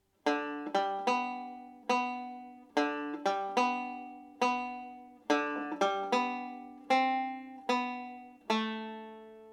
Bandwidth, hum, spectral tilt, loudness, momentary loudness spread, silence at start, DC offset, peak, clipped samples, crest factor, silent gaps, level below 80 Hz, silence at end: 12.5 kHz; none; -3.5 dB/octave; -33 LUFS; 15 LU; 0.25 s; under 0.1%; -14 dBFS; under 0.1%; 20 dB; none; -82 dBFS; 0 s